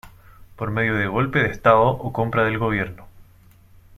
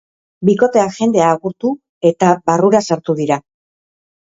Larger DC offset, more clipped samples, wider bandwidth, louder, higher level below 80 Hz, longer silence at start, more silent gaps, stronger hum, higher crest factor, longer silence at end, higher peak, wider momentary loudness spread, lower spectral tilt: neither; neither; first, 13.5 kHz vs 7.8 kHz; second, -20 LUFS vs -15 LUFS; first, -44 dBFS vs -56 dBFS; second, 0.05 s vs 0.4 s; second, none vs 1.89-2.01 s; neither; about the same, 20 dB vs 16 dB; second, 0.75 s vs 0.9 s; about the same, -2 dBFS vs 0 dBFS; first, 10 LU vs 7 LU; first, -7.5 dB/octave vs -6 dB/octave